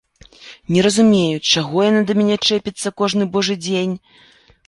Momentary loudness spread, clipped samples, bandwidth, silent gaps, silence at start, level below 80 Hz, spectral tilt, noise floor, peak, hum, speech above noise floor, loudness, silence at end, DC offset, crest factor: 9 LU; under 0.1%; 11.5 kHz; none; 0.4 s; -54 dBFS; -4.5 dB/octave; -43 dBFS; -2 dBFS; none; 26 dB; -16 LUFS; 0.7 s; under 0.1%; 16 dB